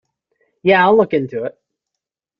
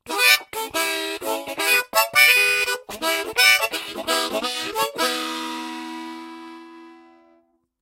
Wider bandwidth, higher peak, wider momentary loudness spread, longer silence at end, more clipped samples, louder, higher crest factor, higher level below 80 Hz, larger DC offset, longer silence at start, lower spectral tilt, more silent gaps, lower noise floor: second, 5.6 kHz vs 16 kHz; about the same, -2 dBFS vs 0 dBFS; second, 14 LU vs 19 LU; about the same, 0.9 s vs 0.85 s; neither; first, -15 LUFS vs -19 LUFS; second, 16 dB vs 22 dB; about the same, -60 dBFS vs -64 dBFS; neither; first, 0.65 s vs 0.05 s; first, -8 dB/octave vs 0.5 dB/octave; neither; first, -83 dBFS vs -62 dBFS